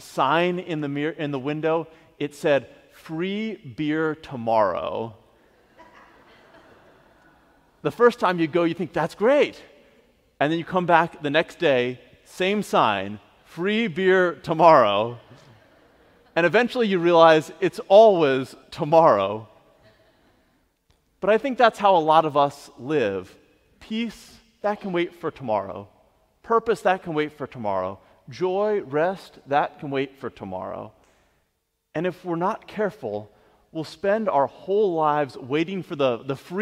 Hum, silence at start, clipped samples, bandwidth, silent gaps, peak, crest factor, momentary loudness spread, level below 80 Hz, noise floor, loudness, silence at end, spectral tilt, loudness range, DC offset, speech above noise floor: none; 0 s; under 0.1%; 14.5 kHz; none; 0 dBFS; 22 dB; 16 LU; -64 dBFS; -74 dBFS; -22 LUFS; 0 s; -6 dB/octave; 11 LU; under 0.1%; 52 dB